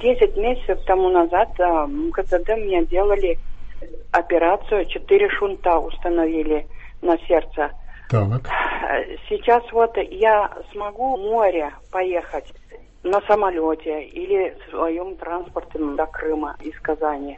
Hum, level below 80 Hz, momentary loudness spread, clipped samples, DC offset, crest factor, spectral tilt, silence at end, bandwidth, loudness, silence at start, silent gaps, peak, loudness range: none; -36 dBFS; 11 LU; under 0.1%; under 0.1%; 18 dB; -8 dB/octave; 0 s; 7.6 kHz; -21 LUFS; 0 s; none; -2 dBFS; 3 LU